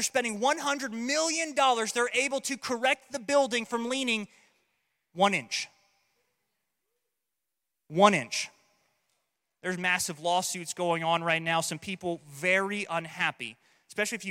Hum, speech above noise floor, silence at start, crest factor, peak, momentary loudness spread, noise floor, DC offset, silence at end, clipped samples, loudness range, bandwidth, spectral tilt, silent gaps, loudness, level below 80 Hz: none; 58 dB; 0 s; 24 dB; -6 dBFS; 10 LU; -86 dBFS; under 0.1%; 0 s; under 0.1%; 5 LU; 16.5 kHz; -2.5 dB/octave; none; -28 LUFS; -78 dBFS